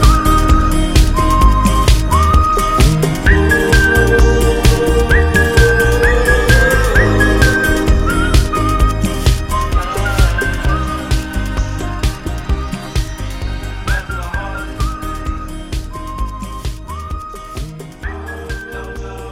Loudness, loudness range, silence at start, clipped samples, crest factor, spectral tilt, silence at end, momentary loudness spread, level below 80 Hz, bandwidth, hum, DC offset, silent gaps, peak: -14 LUFS; 13 LU; 0 s; under 0.1%; 12 dB; -5 dB/octave; 0 s; 15 LU; -16 dBFS; 16 kHz; none; under 0.1%; none; 0 dBFS